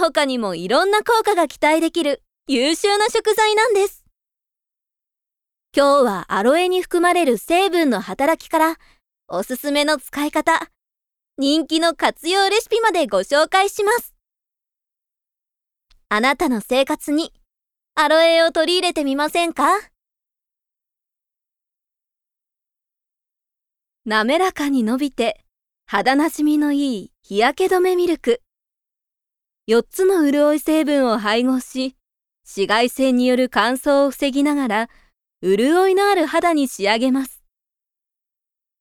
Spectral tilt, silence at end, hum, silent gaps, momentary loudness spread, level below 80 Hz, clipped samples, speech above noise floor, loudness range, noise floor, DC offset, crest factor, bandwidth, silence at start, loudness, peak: -3 dB/octave; 1.5 s; none; none; 8 LU; -56 dBFS; under 0.1%; 69 dB; 5 LU; -87 dBFS; under 0.1%; 18 dB; 18 kHz; 0 s; -18 LUFS; 0 dBFS